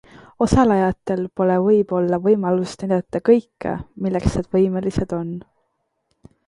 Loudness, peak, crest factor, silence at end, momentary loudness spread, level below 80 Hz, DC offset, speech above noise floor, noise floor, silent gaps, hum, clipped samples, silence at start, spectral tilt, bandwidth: -20 LUFS; -2 dBFS; 18 dB; 1.05 s; 11 LU; -38 dBFS; under 0.1%; 53 dB; -71 dBFS; none; none; under 0.1%; 0.4 s; -7.5 dB/octave; 11 kHz